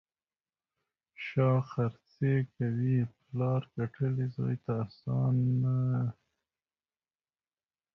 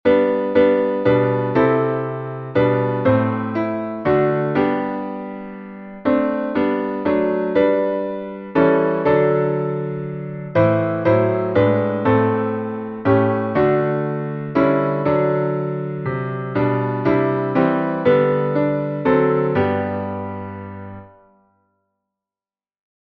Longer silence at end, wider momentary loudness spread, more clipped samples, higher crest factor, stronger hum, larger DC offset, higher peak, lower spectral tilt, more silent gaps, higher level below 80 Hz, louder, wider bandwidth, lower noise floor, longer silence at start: second, 1.85 s vs 2 s; second, 7 LU vs 10 LU; neither; about the same, 18 dB vs 16 dB; neither; neither; second, -16 dBFS vs -2 dBFS; about the same, -10.5 dB/octave vs -10.5 dB/octave; neither; second, -64 dBFS vs -52 dBFS; second, -32 LUFS vs -19 LUFS; about the same, 5.8 kHz vs 5.8 kHz; about the same, under -90 dBFS vs under -90 dBFS; first, 1.2 s vs 0.05 s